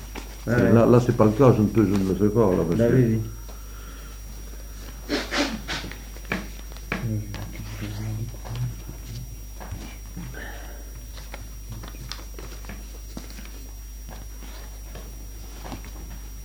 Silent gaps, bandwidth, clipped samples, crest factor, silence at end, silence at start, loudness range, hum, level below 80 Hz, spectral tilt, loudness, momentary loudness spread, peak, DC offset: none; over 20 kHz; under 0.1%; 22 dB; 0 s; 0 s; 19 LU; none; -38 dBFS; -6.5 dB/octave; -23 LUFS; 22 LU; -2 dBFS; under 0.1%